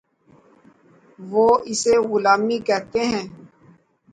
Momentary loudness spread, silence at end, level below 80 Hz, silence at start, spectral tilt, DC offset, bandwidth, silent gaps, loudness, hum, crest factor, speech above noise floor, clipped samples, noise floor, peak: 10 LU; 0.65 s; -58 dBFS; 1.2 s; -3.5 dB/octave; under 0.1%; 9.4 kHz; none; -19 LUFS; none; 18 dB; 36 dB; under 0.1%; -55 dBFS; -4 dBFS